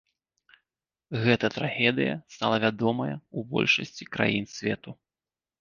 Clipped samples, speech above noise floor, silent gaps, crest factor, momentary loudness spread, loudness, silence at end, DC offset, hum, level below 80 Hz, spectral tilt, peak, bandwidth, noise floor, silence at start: under 0.1%; over 63 dB; none; 22 dB; 12 LU; -27 LUFS; 0.7 s; under 0.1%; none; -64 dBFS; -5.5 dB/octave; -6 dBFS; 7.4 kHz; under -90 dBFS; 1.1 s